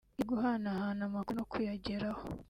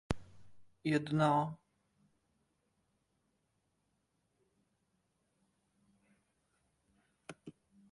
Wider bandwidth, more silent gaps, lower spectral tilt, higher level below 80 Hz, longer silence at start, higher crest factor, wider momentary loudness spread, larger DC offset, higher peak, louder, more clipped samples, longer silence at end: first, 15 kHz vs 11.5 kHz; neither; about the same, -7.5 dB/octave vs -7 dB/octave; first, -60 dBFS vs -66 dBFS; about the same, 0.2 s vs 0.1 s; second, 14 dB vs 26 dB; second, 5 LU vs 24 LU; neither; second, -22 dBFS vs -16 dBFS; about the same, -37 LUFS vs -35 LUFS; neither; second, 0.05 s vs 0.4 s